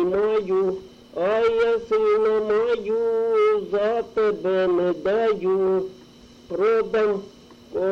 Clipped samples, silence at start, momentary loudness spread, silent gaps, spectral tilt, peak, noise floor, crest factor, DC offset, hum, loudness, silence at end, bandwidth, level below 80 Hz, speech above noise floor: under 0.1%; 0 s; 7 LU; none; -6.5 dB/octave; -12 dBFS; -48 dBFS; 10 dB; under 0.1%; none; -22 LUFS; 0 s; 7 kHz; -56 dBFS; 27 dB